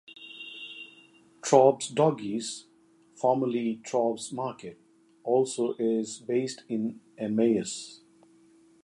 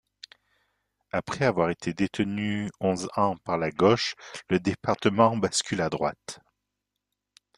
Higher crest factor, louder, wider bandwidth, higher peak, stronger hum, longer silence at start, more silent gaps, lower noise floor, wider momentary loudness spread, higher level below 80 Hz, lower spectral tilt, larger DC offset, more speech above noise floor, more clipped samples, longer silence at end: about the same, 24 dB vs 22 dB; about the same, -28 LUFS vs -26 LUFS; about the same, 11.5 kHz vs 11.5 kHz; about the same, -4 dBFS vs -6 dBFS; second, none vs 50 Hz at -50 dBFS; second, 0.1 s vs 1.15 s; neither; second, -60 dBFS vs -84 dBFS; first, 18 LU vs 10 LU; second, -76 dBFS vs -62 dBFS; about the same, -5 dB/octave vs -5 dB/octave; neither; second, 33 dB vs 58 dB; neither; second, 0.9 s vs 1.2 s